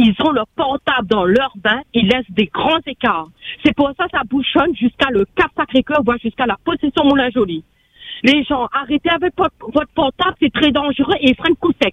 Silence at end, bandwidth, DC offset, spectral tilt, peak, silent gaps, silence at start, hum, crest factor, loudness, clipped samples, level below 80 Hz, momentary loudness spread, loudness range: 0 s; 8.6 kHz; under 0.1%; -6.5 dB/octave; 0 dBFS; none; 0 s; none; 16 dB; -16 LUFS; under 0.1%; -44 dBFS; 5 LU; 1 LU